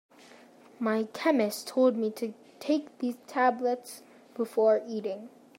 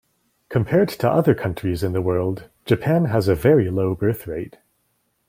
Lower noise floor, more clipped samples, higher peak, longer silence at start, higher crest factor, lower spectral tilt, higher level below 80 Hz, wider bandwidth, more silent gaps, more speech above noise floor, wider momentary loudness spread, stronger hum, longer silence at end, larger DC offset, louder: second, -54 dBFS vs -69 dBFS; neither; second, -12 dBFS vs -4 dBFS; first, 0.8 s vs 0.5 s; about the same, 18 dB vs 18 dB; second, -5 dB/octave vs -8 dB/octave; second, -88 dBFS vs -48 dBFS; about the same, 16 kHz vs 16.5 kHz; neither; second, 26 dB vs 49 dB; first, 14 LU vs 11 LU; neither; second, 0.3 s vs 0.8 s; neither; second, -29 LUFS vs -20 LUFS